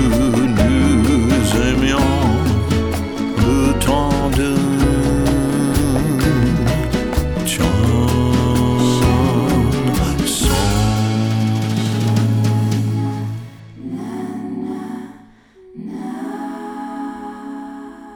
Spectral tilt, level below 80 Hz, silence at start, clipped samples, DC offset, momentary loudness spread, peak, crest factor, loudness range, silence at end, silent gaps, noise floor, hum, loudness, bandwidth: -6 dB/octave; -26 dBFS; 0 s; under 0.1%; under 0.1%; 14 LU; -4 dBFS; 12 dB; 12 LU; 0 s; none; -45 dBFS; none; -17 LUFS; over 20 kHz